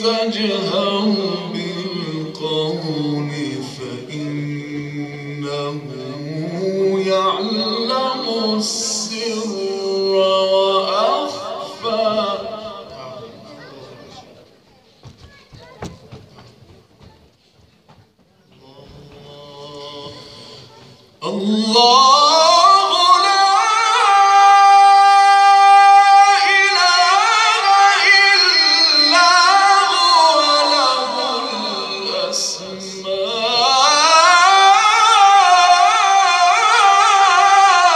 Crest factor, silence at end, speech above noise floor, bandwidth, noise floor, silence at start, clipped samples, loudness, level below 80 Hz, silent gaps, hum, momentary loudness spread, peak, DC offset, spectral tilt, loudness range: 14 dB; 0 s; 37 dB; 12 kHz; -54 dBFS; 0 s; under 0.1%; -12 LUFS; -62 dBFS; none; none; 18 LU; 0 dBFS; under 0.1%; -2 dB/octave; 15 LU